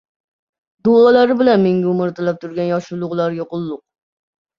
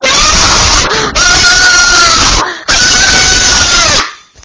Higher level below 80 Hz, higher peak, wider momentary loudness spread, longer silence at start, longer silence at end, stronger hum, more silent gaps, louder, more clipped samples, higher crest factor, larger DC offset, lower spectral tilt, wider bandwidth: second, -60 dBFS vs -20 dBFS; about the same, -2 dBFS vs 0 dBFS; first, 13 LU vs 6 LU; first, 0.85 s vs 0 s; first, 0.8 s vs 0.3 s; neither; neither; second, -16 LUFS vs -5 LUFS; second, under 0.1% vs 4%; first, 16 dB vs 8 dB; neither; first, -8 dB/octave vs -0.5 dB/octave; second, 7 kHz vs 8 kHz